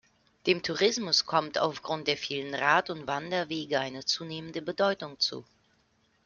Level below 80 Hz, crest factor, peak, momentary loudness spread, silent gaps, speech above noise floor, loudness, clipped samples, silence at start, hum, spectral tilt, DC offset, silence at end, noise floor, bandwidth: -70 dBFS; 22 dB; -8 dBFS; 9 LU; none; 40 dB; -29 LUFS; under 0.1%; 0.45 s; none; -3 dB/octave; under 0.1%; 0.85 s; -69 dBFS; 7.4 kHz